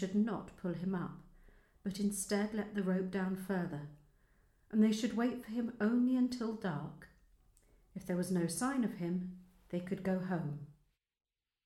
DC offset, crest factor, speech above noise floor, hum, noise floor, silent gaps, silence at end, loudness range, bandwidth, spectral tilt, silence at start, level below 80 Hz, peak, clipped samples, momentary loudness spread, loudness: under 0.1%; 18 dB; over 54 dB; none; under -90 dBFS; none; 0.95 s; 4 LU; 14.5 kHz; -6 dB/octave; 0 s; -66 dBFS; -20 dBFS; under 0.1%; 16 LU; -37 LUFS